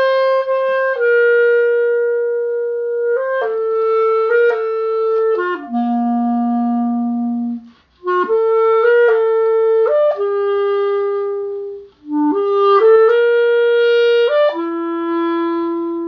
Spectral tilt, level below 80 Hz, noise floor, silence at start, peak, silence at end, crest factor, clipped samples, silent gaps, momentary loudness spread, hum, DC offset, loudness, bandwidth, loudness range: -6.5 dB/octave; -64 dBFS; -37 dBFS; 0 s; -2 dBFS; 0 s; 14 dB; under 0.1%; none; 8 LU; none; under 0.1%; -15 LUFS; 5.6 kHz; 4 LU